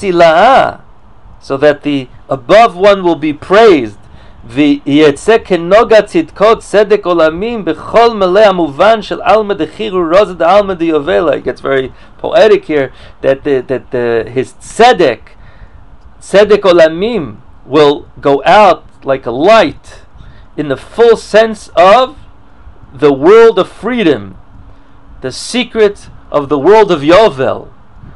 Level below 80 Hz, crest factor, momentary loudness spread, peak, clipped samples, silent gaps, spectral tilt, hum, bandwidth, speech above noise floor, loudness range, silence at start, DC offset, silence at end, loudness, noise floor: -38 dBFS; 10 dB; 12 LU; 0 dBFS; 2%; none; -5.5 dB/octave; none; 11.5 kHz; 30 dB; 3 LU; 0 s; 1%; 0.55 s; -9 LUFS; -38 dBFS